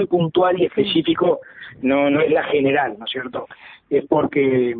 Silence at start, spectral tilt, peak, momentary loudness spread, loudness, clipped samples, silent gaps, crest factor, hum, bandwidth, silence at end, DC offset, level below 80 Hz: 0 s; -11 dB/octave; -4 dBFS; 10 LU; -19 LUFS; under 0.1%; none; 14 dB; none; 4.7 kHz; 0 s; under 0.1%; -56 dBFS